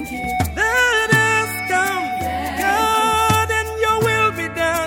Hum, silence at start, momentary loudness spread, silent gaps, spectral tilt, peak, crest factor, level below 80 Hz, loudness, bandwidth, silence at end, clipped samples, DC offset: none; 0 s; 7 LU; none; -3.5 dB/octave; -2 dBFS; 18 dB; -38 dBFS; -17 LUFS; 17 kHz; 0 s; under 0.1%; under 0.1%